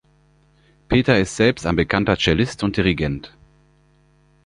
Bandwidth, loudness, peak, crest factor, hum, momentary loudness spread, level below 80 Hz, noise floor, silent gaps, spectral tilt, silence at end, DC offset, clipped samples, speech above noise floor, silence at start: 10.5 kHz; -19 LUFS; -2 dBFS; 20 dB; 50 Hz at -40 dBFS; 6 LU; -38 dBFS; -57 dBFS; none; -5.5 dB/octave; 1.2 s; under 0.1%; under 0.1%; 38 dB; 0.9 s